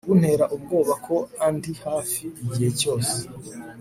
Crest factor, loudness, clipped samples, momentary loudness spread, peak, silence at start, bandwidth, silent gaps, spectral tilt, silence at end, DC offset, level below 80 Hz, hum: 18 dB; -24 LUFS; under 0.1%; 9 LU; -6 dBFS; 0.05 s; 16 kHz; none; -5.5 dB/octave; 0 s; under 0.1%; -58 dBFS; none